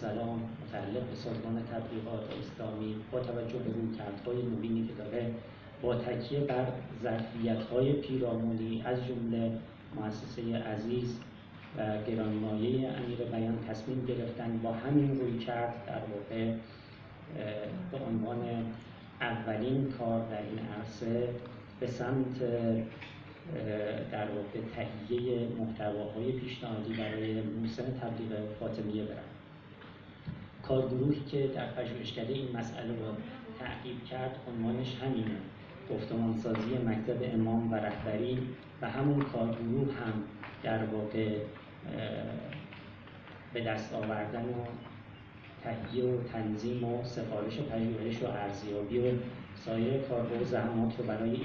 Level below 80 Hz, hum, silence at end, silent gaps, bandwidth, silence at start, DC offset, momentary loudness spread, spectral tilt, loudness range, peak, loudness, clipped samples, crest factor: -60 dBFS; none; 0 s; none; 7 kHz; 0 s; under 0.1%; 12 LU; -6.5 dB/octave; 5 LU; -16 dBFS; -36 LUFS; under 0.1%; 20 dB